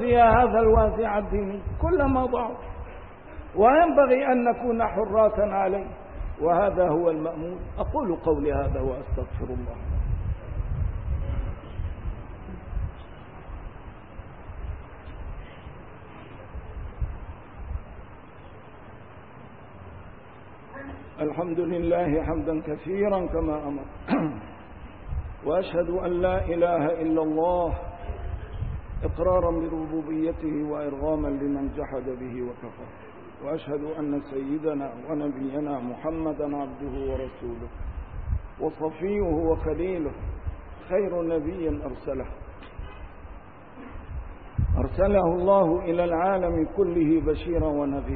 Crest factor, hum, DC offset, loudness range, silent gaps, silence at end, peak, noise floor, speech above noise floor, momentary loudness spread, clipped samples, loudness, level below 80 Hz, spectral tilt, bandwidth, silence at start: 20 dB; none; 0.3%; 17 LU; none; 0 s; -8 dBFS; -46 dBFS; 22 dB; 22 LU; under 0.1%; -26 LUFS; -36 dBFS; -12 dB/octave; 4.6 kHz; 0 s